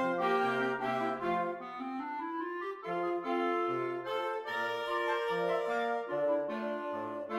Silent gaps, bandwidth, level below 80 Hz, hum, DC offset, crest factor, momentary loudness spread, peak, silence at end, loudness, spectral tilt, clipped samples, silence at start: none; 15.5 kHz; -78 dBFS; none; under 0.1%; 14 dB; 7 LU; -20 dBFS; 0 s; -34 LUFS; -5.5 dB/octave; under 0.1%; 0 s